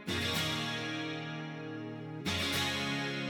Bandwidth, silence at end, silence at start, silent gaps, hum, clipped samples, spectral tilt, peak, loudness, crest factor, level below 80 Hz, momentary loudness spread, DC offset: 19 kHz; 0 s; 0 s; none; none; under 0.1%; -3.5 dB/octave; -20 dBFS; -35 LUFS; 16 dB; -62 dBFS; 10 LU; under 0.1%